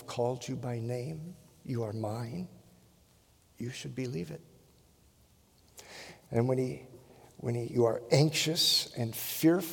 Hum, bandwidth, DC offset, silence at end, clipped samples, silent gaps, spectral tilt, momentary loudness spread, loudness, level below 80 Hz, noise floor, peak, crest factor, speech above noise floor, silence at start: none; 18 kHz; under 0.1%; 0 s; under 0.1%; none; -4.5 dB/octave; 21 LU; -31 LUFS; -68 dBFS; -64 dBFS; -8 dBFS; 24 dB; 33 dB; 0 s